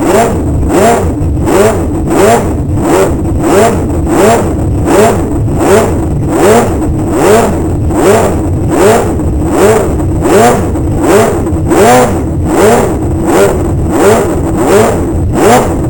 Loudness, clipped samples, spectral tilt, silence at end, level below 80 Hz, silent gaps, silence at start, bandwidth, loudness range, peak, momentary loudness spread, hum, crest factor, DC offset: -8 LUFS; 0.7%; -6 dB/octave; 0 s; -18 dBFS; none; 0 s; 20 kHz; 1 LU; 0 dBFS; 5 LU; none; 8 dB; under 0.1%